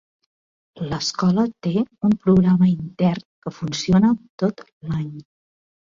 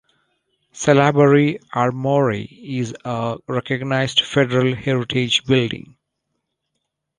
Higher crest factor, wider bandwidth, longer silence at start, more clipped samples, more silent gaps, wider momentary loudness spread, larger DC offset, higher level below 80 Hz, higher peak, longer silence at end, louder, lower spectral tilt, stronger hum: about the same, 16 dB vs 18 dB; second, 7.6 kHz vs 10.5 kHz; about the same, 0.75 s vs 0.75 s; neither; first, 3.25-3.42 s, 4.30-4.38 s, 4.72-4.81 s vs none; about the same, 14 LU vs 12 LU; neither; first, -50 dBFS vs -56 dBFS; about the same, -4 dBFS vs -2 dBFS; second, 0.75 s vs 1.4 s; about the same, -20 LUFS vs -18 LUFS; first, -7 dB/octave vs -5.5 dB/octave; neither